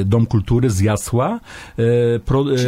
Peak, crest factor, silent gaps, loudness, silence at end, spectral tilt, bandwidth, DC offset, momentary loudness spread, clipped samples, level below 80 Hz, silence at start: -4 dBFS; 14 dB; none; -17 LUFS; 0 s; -7 dB/octave; 15.5 kHz; under 0.1%; 6 LU; under 0.1%; -36 dBFS; 0 s